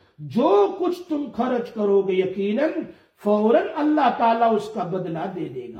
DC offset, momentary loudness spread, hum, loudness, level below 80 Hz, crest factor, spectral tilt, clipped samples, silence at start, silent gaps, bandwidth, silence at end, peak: under 0.1%; 10 LU; none; -22 LUFS; -66 dBFS; 16 dB; -7.5 dB/octave; under 0.1%; 0.2 s; none; 9.8 kHz; 0 s; -6 dBFS